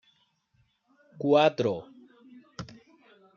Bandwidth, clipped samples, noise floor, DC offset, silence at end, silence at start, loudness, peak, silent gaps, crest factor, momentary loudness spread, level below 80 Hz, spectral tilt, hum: 7.2 kHz; under 0.1%; -70 dBFS; under 0.1%; 0.7 s; 1.15 s; -26 LUFS; -8 dBFS; none; 22 dB; 23 LU; -70 dBFS; -4.5 dB/octave; none